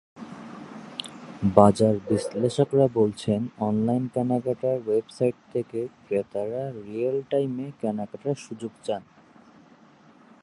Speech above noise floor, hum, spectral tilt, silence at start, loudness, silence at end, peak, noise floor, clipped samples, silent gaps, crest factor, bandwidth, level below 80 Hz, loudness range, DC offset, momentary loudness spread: 29 dB; none; -7.5 dB/octave; 0.15 s; -26 LUFS; 1.4 s; -2 dBFS; -54 dBFS; under 0.1%; none; 24 dB; 11.5 kHz; -58 dBFS; 8 LU; under 0.1%; 15 LU